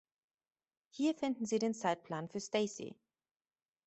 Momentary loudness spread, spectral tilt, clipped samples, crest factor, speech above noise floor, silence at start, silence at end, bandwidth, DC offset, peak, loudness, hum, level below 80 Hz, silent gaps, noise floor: 12 LU; -4.5 dB/octave; under 0.1%; 20 dB; over 53 dB; 0.95 s; 0.95 s; 8.2 kHz; under 0.1%; -20 dBFS; -37 LUFS; none; -82 dBFS; none; under -90 dBFS